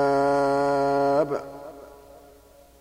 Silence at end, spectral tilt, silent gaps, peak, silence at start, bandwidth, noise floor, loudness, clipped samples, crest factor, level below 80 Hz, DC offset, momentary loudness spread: 0.85 s; -6.5 dB/octave; none; -10 dBFS; 0 s; 16 kHz; -52 dBFS; -23 LUFS; under 0.1%; 16 dB; -56 dBFS; under 0.1%; 19 LU